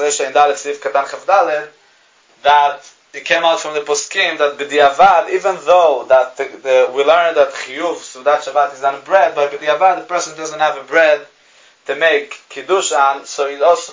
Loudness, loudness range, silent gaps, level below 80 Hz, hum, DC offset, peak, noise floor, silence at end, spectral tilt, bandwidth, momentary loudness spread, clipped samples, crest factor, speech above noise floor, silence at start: -14 LUFS; 3 LU; none; -62 dBFS; none; under 0.1%; 0 dBFS; -52 dBFS; 0 s; -1.5 dB/octave; 7.8 kHz; 10 LU; under 0.1%; 14 dB; 37 dB; 0 s